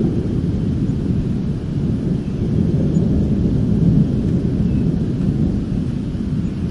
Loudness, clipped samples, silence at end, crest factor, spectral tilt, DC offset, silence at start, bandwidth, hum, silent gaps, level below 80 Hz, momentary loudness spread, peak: -19 LUFS; under 0.1%; 0 s; 14 dB; -10 dB/octave; 0.3%; 0 s; 10.5 kHz; none; none; -28 dBFS; 5 LU; -2 dBFS